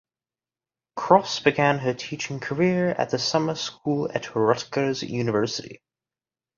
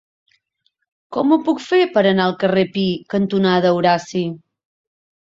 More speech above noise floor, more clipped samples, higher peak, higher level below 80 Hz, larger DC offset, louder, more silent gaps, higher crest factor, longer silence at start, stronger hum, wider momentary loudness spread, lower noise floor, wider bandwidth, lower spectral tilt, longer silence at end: first, over 66 dB vs 52 dB; neither; about the same, -2 dBFS vs -2 dBFS; about the same, -64 dBFS vs -60 dBFS; neither; second, -24 LUFS vs -17 LUFS; neither; first, 22 dB vs 16 dB; second, 0.95 s vs 1.1 s; neither; about the same, 10 LU vs 9 LU; first, under -90 dBFS vs -69 dBFS; about the same, 7.4 kHz vs 7.8 kHz; second, -5 dB/octave vs -6.5 dB/octave; about the same, 0.85 s vs 0.95 s